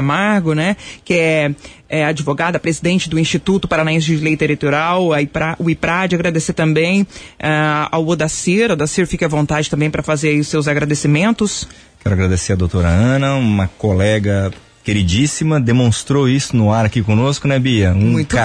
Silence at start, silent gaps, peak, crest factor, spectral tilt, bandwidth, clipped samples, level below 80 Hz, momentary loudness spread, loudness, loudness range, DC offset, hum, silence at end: 0 s; none; -4 dBFS; 12 dB; -5.5 dB/octave; 11 kHz; under 0.1%; -36 dBFS; 4 LU; -15 LUFS; 1 LU; under 0.1%; none; 0 s